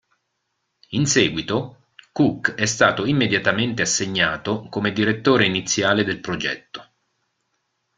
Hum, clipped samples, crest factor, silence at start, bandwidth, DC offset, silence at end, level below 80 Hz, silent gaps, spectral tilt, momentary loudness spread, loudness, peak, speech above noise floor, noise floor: none; under 0.1%; 20 dB; 0.9 s; 9.6 kHz; under 0.1%; 1.15 s; -56 dBFS; none; -3.5 dB/octave; 9 LU; -20 LUFS; -2 dBFS; 54 dB; -75 dBFS